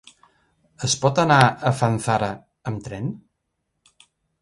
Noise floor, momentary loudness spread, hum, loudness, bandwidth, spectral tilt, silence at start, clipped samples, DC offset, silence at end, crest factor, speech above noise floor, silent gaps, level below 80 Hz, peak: -76 dBFS; 16 LU; none; -21 LUFS; 11.5 kHz; -4.5 dB/octave; 0.8 s; under 0.1%; under 0.1%; 1.25 s; 22 dB; 56 dB; none; -54 dBFS; -2 dBFS